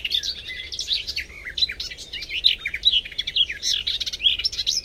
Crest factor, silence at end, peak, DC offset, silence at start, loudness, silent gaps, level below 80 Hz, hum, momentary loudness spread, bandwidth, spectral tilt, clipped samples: 22 dB; 0 s; -4 dBFS; under 0.1%; 0 s; -22 LUFS; none; -46 dBFS; none; 12 LU; 16.5 kHz; 1 dB/octave; under 0.1%